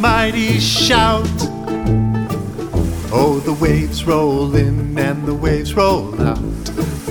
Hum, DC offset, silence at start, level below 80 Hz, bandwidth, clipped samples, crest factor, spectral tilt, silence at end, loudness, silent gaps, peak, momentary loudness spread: none; under 0.1%; 0 s; -28 dBFS; over 20 kHz; under 0.1%; 16 dB; -5.5 dB/octave; 0 s; -16 LUFS; none; 0 dBFS; 9 LU